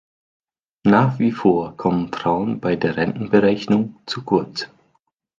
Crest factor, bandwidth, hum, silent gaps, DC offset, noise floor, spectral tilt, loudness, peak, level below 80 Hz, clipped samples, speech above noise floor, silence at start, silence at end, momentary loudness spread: 18 dB; 7.4 kHz; none; none; under 0.1%; -67 dBFS; -7.5 dB/octave; -20 LUFS; -2 dBFS; -54 dBFS; under 0.1%; 48 dB; 0.85 s; 0.75 s; 10 LU